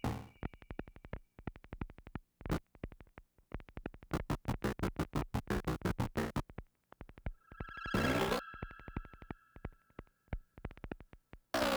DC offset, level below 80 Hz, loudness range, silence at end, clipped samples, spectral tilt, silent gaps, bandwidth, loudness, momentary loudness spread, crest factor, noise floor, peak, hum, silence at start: under 0.1%; -50 dBFS; 9 LU; 0 s; under 0.1%; -5.5 dB/octave; none; over 20 kHz; -41 LUFS; 16 LU; 20 dB; -61 dBFS; -20 dBFS; none; 0.05 s